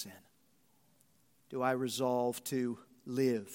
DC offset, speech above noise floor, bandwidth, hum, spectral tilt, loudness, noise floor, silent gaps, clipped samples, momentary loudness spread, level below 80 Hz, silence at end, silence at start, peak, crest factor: under 0.1%; 38 dB; 16.5 kHz; none; -5 dB/octave; -35 LUFS; -72 dBFS; none; under 0.1%; 12 LU; -82 dBFS; 0 s; 0 s; -18 dBFS; 20 dB